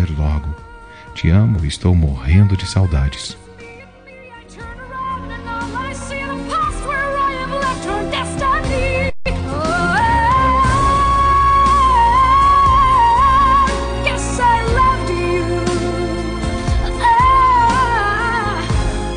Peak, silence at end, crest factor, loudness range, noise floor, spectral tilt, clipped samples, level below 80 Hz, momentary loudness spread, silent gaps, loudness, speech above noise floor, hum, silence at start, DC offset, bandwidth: -2 dBFS; 0 s; 12 dB; 11 LU; -39 dBFS; -5.5 dB/octave; under 0.1%; -24 dBFS; 13 LU; none; -15 LUFS; 25 dB; none; 0 s; under 0.1%; 10 kHz